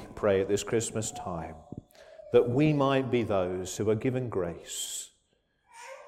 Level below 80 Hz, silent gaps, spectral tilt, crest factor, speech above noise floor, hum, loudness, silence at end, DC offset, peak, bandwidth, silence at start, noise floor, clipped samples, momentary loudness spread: -58 dBFS; none; -5.5 dB/octave; 20 dB; 44 dB; none; -29 LUFS; 0 s; under 0.1%; -10 dBFS; 16 kHz; 0 s; -72 dBFS; under 0.1%; 21 LU